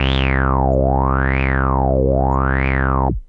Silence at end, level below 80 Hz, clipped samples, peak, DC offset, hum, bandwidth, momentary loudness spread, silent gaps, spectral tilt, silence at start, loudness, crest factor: 0.05 s; -20 dBFS; under 0.1%; -2 dBFS; under 0.1%; none; 5 kHz; 1 LU; none; -9 dB/octave; 0 s; -17 LUFS; 14 dB